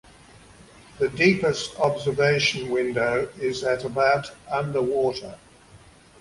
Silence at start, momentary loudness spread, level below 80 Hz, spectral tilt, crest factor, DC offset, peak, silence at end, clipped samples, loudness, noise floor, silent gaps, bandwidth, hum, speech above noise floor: 0.95 s; 8 LU; -56 dBFS; -5 dB/octave; 20 dB; under 0.1%; -6 dBFS; 0.45 s; under 0.1%; -23 LUFS; -51 dBFS; none; 11.5 kHz; none; 28 dB